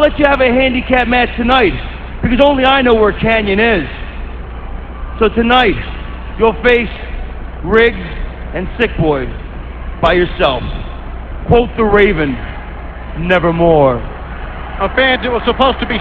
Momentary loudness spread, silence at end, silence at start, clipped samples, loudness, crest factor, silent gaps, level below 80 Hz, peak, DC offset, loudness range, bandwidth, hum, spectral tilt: 18 LU; 0 s; 0 s; under 0.1%; -12 LUFS; 14 dB; none; -24 dBFS; 0 dBFS; 0.7%; 4 LU; 7 kHz; none; -8 dB/octave